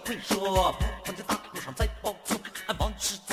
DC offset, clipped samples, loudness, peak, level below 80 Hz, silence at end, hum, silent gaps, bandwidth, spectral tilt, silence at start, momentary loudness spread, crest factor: under 0.1%; under 0.1%; -30 LUFS; -12 dBFS; -38 dBFS; 0 s; none; none; 16 kHz; -3.5 dB/octave; 0 s; 9 LU; 18 dB